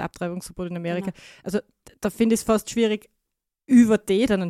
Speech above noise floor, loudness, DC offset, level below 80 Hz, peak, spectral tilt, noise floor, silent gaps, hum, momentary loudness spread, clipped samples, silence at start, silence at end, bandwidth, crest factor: 59 dB; -23 LUFS; under 0.1%; -52 dBFS; -6 dBFS; -5.5 dB/octave; -81 dBFS; none; none; 14 LU; under 0.1%; 0 s; 0 s; 14.5 kHz; 18 dB